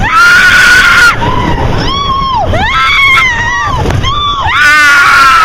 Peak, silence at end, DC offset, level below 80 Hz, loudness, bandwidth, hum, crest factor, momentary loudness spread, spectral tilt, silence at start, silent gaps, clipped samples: 0 dBFS; 0 s; under 0.1%; -20 dBFS; -5 LUFS; 20 kHz; none; 6 dB; 9 LU; -3 dB/octave; 0 s; none; 4%